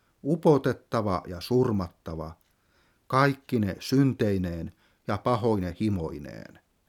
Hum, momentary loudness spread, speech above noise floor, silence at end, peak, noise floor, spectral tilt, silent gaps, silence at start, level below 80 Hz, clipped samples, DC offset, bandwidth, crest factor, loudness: none; 16 LU; 40 dB; 0.45 s; -6 dBFS; -66 dBFS; -7.5 dB/octave; none; 0.25 s; -52 dBFS; under 0.1%; under 0.1%; 17 kHz; 22 dB; -27 LUFS